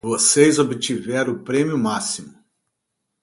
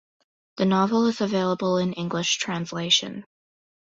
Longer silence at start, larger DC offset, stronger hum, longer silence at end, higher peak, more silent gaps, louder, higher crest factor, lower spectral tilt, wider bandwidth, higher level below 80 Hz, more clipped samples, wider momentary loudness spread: second, 0.05 s vs 0.55 s; neither; neither; first, 0.95 s vs 0.7 s; first, 0 dBFS vs -8 dBFS; neither; first, -19 LUFS vs -23 LUFS; about the same, 20 dB vs 18 dB; about the same, -3.5 dB/octave vs -4 dB/octave; first, 11.5 kHz vs 8 kHz; about the same, -62 dBFS vs -66 dBFS; neither; about the same, 10 LU vs 8 LU